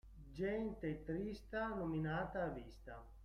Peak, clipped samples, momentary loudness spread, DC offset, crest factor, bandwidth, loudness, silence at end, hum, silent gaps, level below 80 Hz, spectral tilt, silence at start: -30 dBFS; under 0.1%; 14 LU; under 0.1%; 14 dB; 12 kHz; -43 LUFS; 0 s; none; none; -58 dBFS; -8 dB/octave; 0.05 s